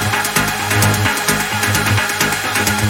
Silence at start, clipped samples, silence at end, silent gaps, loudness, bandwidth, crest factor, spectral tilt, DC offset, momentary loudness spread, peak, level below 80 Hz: 0 s; under 0.1%; 0 s; none; -15 LUFS; 17 kHz; 16 dB; -3 dB/octave; under 0.1%; 2 LU; 0 dBFS; -38 dBFS